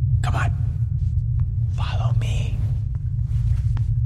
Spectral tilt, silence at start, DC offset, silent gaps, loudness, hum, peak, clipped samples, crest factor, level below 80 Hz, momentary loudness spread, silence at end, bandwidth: -7 dB/octave; 0 s; under 0.1%; none; -23 LUFS; none; -10 dBFS; under 0.1%; 12 dB; -26 dBFS; 3 LU; 0 s; 9 kHz